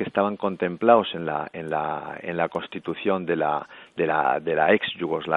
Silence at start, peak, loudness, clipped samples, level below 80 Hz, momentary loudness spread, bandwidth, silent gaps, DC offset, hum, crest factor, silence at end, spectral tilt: 0 s; -2 dBFS; -24 LUFS; under 0.1%; -66 dBFS; 11 LU; 4.5 kHz; none; under 0.1%; none; 22 dB; 0 s; -7.5 dB/octave